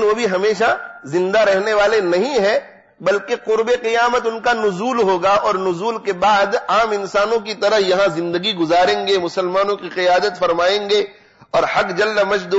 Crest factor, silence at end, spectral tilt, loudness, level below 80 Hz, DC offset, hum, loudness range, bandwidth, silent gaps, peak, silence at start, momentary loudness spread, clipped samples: 10 dB; 0 s; -4 dB/octave; -17 LUFS; -52 dBFS; under 0.1%; none; 1 LU; 8 kHz; none; -8 dBFS; 0 s; 5 LU; under 0.1%